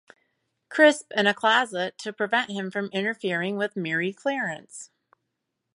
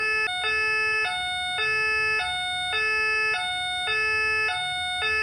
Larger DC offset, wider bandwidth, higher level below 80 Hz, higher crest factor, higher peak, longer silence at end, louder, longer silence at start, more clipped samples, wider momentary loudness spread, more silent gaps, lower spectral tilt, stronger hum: neither; second, 11.5 kHz vs 16 kHz; second, -80 dBFS vs -54 dBFS; first, 22 dB vs 10 dB; first, -4 dBFS vs -16 dBFS; first, 0.9 s vs 0 s; about the same, -24 LUFS vs -23 LUFS; first, 0.7 s vs 0 s; neither; first, 12 LU vs 4 LU; neither; first, -4 dB/octave vs -0.5 dB/octave; neither